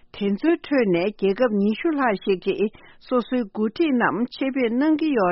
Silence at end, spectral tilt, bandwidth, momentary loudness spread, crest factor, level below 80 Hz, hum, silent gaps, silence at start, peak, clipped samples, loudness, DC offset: 0 s; -5 dB/octave; 5.8 kHz; 5 LU; 16 dB; -58 dBFS; none; none; 0.15 s; -6 dBFS; under 0.1%; -22 LUFS; under 0.1%